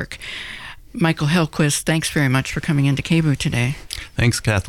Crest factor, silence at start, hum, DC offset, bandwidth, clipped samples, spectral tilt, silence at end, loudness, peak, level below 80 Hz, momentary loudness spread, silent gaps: 14 dB; 0 s; none; under 0.1%; 16.5 kHz; under 0.1%; -5 dB/octave; 0 s; -20 LUFS; -6 dBFS; -40 dBFS; 12 LU; none